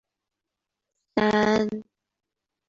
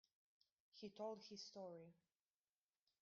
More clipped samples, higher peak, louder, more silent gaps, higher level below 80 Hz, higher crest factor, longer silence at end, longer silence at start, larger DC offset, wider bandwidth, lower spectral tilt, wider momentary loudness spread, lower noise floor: neither; first, -8 dBFS vs -40 dBFS; first, -24 LUFS vs -56 LUFS; neither; first, -60 dBFS vs under -90 dBFS; about the same, 20 dB vs 20 dB; second, 0.85 s vs 1.1 s; first, 1.15 s vs 0.75 s; neither; about the same, 7.6 kHz vs 7.2 kHz; first, -5.5 dB/octave vs -4 dB/octave; about the same, 10 LU vs 9 LU; second, -85 dBFS vs under -90 dBFS